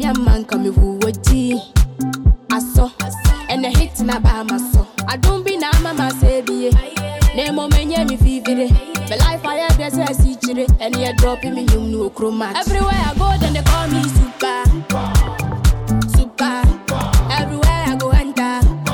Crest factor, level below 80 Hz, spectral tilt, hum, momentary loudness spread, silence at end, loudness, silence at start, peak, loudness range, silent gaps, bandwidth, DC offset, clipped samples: 10 dB; -18 dBFS; -5.5 dB/octave; none; 4 LU; 0 s; -17 LUFS; 0 s; -4 dBFS; 1 LU; none; 18 kHz; under 0.1%; under 0.1%